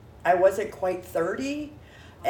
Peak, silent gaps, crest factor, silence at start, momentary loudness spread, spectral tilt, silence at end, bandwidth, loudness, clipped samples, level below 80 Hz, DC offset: -8 dBFS; none; 18 dB; 0 s; 12 LU; -5 dB/octave; 0 s; 19 kHz; -26 LUFS; under 0.1%; -56 dBFS; under 0.1%